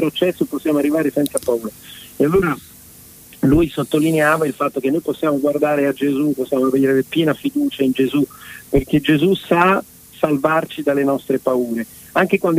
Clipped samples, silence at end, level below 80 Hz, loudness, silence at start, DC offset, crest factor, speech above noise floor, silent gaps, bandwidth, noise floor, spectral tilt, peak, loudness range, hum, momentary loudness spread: under 0.1%; 0 s; -42 dBFS; -18 LUFS; 0 s; under 0.1%; 16 dB; 25 dB; none; 16 kHz; -42 dBFS; -6 dB/octave; -2 dBFS; 2 LU; none; 7 LU